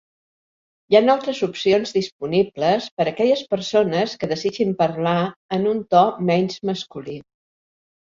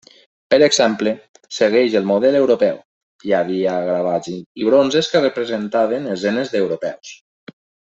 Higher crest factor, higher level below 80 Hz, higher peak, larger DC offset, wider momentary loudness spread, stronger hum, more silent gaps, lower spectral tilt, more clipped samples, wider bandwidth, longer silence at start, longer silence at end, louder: about the same, 18 dB vs 16 dB; about the same, -62 dBFS vs -62 dBFS; about the same, -2 dBFS vs -2 dBFS; neither; second, 9 LU vs 14 LU; neither; second, 2.12-2.19 s, 2.91-2.97 s, 5.36-5.49 s vs 1.29-1.34 s, 2.85-3.19 s, 4.46-4.55 s; first, -6 dB/octave vs -4 dB/octave; neither; about the same, 7.6 kHz vs 8.2 kHz; first, 0.9 s vs 0.5 s; about the same, 0.9 s vs 0.85 s; second, -20 LUFS vs -17 LUFS